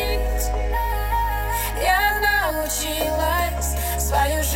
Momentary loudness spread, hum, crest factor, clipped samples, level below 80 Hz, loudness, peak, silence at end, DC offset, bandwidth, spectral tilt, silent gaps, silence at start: 6 LU; none; 14 dB; under 0.1%; -26 dBFS; -22 LUFS; -6 dBFS; 0 s; under 0.1%; 16.5 kHz; -3 dB/octave; none; 0 s